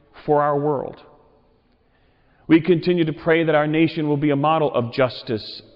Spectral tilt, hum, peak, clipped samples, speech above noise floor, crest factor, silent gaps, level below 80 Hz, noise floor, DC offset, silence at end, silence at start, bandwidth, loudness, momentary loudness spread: -9.5 dB/octave; none; -6 dBFS; under 0.1%; 40 dB; 14 dB; none; -56 dBFS; -60 dBFS; under 0.1%; 0.15 s; 0.15 s; 5.6 kHz; -20 LUFS; 10 LU